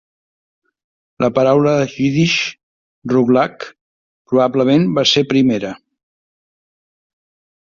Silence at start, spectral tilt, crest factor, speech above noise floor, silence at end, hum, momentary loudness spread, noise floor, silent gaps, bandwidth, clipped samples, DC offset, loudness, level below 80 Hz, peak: 1.2 s; -5.5 dB/octave; 16 dB; over 76 dB; 2 s; none; 11 LU; under -90 dBFS; 2.63-3.02 s, 3.81-4.25 s; 7.4 kHz; under 0.1%; under 0.1%; -15 LUFS; -56 dBFS; -2 dBFS